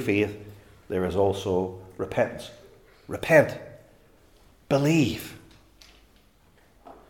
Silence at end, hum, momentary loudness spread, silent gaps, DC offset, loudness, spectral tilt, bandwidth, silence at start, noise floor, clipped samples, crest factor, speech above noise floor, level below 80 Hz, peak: 0.15 s; none; 22 LU; none; under 0.1%; -25 LUFS; -6 dB/octave; 18 kHz; 0 s; -59 dBFS; under 0.1%; 24 dB; 35 dB; -56 dBFS; -4 dBFS